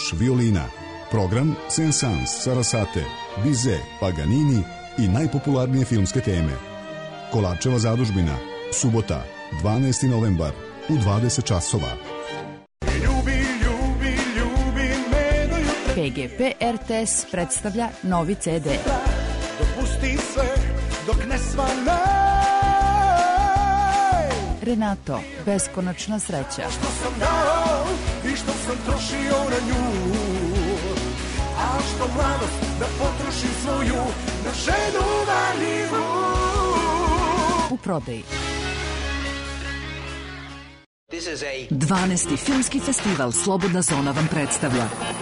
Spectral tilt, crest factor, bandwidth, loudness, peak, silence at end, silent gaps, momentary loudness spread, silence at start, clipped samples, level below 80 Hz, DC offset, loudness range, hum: -4.5 dB/octave; 12 dB; 11 kHz; -23 LUFS; -10 dBFS; 0 s; 40.86-41.07 s; 8 LU; 0 s; under 0.1%; -30 dBFS; under 0.1%; 4 LU; none